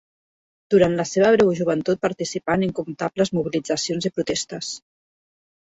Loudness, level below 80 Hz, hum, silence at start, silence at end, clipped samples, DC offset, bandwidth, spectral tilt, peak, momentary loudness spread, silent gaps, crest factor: -22 LUFS; -56 dBFS; none; 0.7 s; 0.9 s; under 0.1%; under 0.1%; 8 kHz; -5 dB/octave; -4 dBFS; 10 LU; none; 18 dB